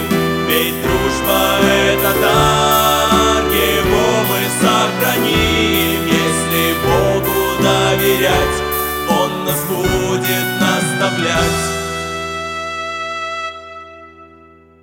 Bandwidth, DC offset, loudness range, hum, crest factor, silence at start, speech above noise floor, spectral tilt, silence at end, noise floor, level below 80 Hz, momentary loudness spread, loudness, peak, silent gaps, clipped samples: 17 kHz; under 0.1%; 5 LU; none; 16 dB; 0 s; 30 dB; -4 dB/octave; 0.55 s; -44 dBFS; -32 dBFS; 10 LU; -14 LUFS; 0 dBFS; none; under 0.1%